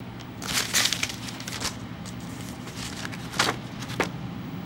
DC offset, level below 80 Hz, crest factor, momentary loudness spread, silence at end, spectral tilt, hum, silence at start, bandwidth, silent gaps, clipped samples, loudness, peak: under 0.1%; -52 dBFS; 28 dB; 14 LU; 0 s; -2.5 dB/octave; none; 0 s; 17.5 kHz; none; under 0.1%; -29 LUFS; -4 dBFS